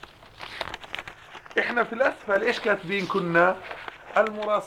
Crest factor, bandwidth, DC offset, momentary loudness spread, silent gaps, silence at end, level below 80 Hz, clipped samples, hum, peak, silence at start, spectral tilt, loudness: 20 dB; 15.5 kHz; under 0.1%; 17 LU; none; 0 s; -60 dBFS; under 0.1%; none; -6 dBFS; 0 s; -5 dB/octave; -25 LUFS